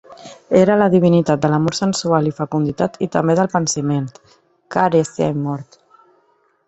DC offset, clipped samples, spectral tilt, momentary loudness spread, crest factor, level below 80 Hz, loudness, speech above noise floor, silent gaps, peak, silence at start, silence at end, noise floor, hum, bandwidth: under 0.1%; under 0.1%; -6 dB/octave; 10 LU; 18 dB; -54 dBFS; -17 LUFS; 43 dB; none; 0 dBFS; 0.1 s; 1.05 s; -60 dBFS; none; 8.2 kHz